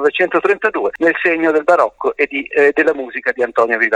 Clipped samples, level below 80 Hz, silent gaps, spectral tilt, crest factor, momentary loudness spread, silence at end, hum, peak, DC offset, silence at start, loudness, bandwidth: under 0.1%; -58 dBFS; none; -5 dB/octave; 14 dB; 5 LU; 0 s; none; 0 dBFS; under 0.1%; 0 s; -15 LUFS; 9.6 kHz